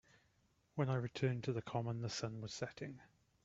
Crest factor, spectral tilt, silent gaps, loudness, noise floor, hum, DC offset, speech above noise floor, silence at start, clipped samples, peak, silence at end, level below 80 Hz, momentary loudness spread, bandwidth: 20 dB; -6 dB/octave; none; -42 LUFS; -77 dBFS; none; under 0.1%; 36 dB; 0.75 s; under 0.1%; -24 dBFS; 0.4 s; -74 dBFS; 12 LU; 7.8 kHz